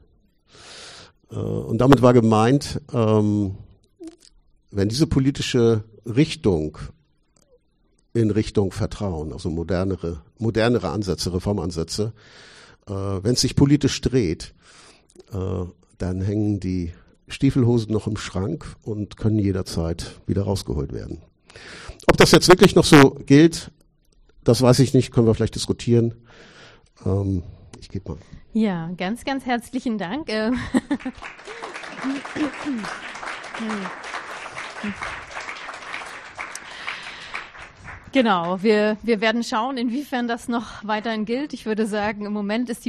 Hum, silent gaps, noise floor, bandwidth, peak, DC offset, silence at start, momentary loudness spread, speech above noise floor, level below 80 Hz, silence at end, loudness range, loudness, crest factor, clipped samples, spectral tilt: none; none; -63 dBFS; 13 kHz; -2 dBFS; under 0.1%; 0.65 s; 18 LU; 43 dB; -42 dBFS; 0.05 s; 13 LU; -21 LUFS; 20 dB; under 0.1%; -6 dB/octave